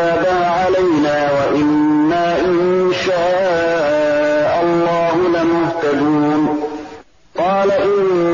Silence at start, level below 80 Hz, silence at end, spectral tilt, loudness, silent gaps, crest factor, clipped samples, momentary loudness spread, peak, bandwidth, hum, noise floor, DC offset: 0 s; -48 dBFS; 0 s; -6.5 dB/octave; -15 LUFS; none; 10 dB; under 0.1%; 3 LU; -6 dBFS; 7.4 kHz; none; -38 dBFS; 0.3%